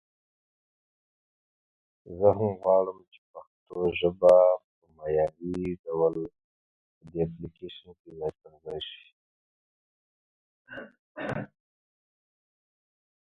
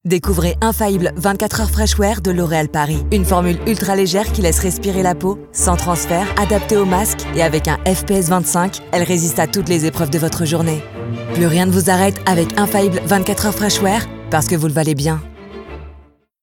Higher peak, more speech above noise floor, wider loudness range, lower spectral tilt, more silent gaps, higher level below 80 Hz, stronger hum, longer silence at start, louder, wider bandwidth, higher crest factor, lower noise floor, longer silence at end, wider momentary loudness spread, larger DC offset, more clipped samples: second, -6 dBFS vs 0 dBFS; first, over 63 dB vs 29 dB; first, 18 LU vs 1 LU; first, -7.5 dB/octave vs -5 dB/octave; first, 3.18-3.34 s, 3.47-3.66 s, 4.64-4.82 s, 5.79-5.84 s, 6.44-7.01 s, 7.99-8.04 s, 9.12-10.65 s, 10.99-11.15 s vs none; second, -58 dBFS vs -26 dBFS; neither; first, 2.05 s vs 0.05 s; second, -27 LUFS vs -16 LUFS; second, 6.6 kHz vs 18.5 kHz; first, 24 dB vs 16 dB; first, under -90 dBFS vs -45 dBFS; first, 1.85 s vs 0.4 s; first, 23 LU vs 5 LU; neither; neither